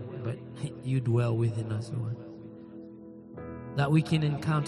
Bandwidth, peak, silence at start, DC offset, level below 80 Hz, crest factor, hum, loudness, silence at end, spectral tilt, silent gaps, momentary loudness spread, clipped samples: 11.5 kHz; -12 dBFS; 0 s; under 0.1%; -60 dBFS; 18 dB; none; -30 LUFS; 0 s; -7.5 dB/octave; none; 20 LU; under 0.1%